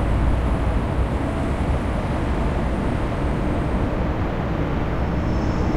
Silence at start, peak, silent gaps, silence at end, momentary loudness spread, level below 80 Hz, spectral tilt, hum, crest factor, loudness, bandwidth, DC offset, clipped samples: 0 s; -8 dBFS; none; 0 s; 2 LU; -24 dBFS; -8 dB/octave; none; 12 dB; -23 LUFS; 10.5 kHz; under 0.1%; under 0.1%